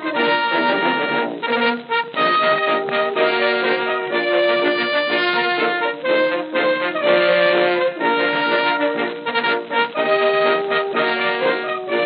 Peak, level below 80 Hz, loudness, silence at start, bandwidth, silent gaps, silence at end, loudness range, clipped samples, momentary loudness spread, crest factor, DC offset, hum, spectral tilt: -2 dBFS; under -90 dBFS; -18 LUFS; 0 s; 5.2 kHz; none; 0 s; 1 LU; under 0.1%; 4 LU; 16 dB; under 0.1%; none; -0.5 dB/octave